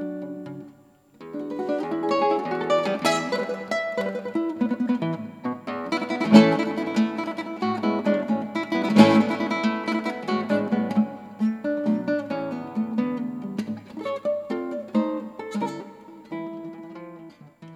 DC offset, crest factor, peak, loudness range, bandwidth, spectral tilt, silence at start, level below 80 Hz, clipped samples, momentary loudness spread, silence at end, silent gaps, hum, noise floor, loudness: under 0.1%; 24 dB; 0 dBFS; 8 LU; 12.5 kHz; -6 dB/octave; 0 s; -70 dBFS; under 0.1%; 14 LU; 0 s; none; none; -54 dBFS; -24 LUFS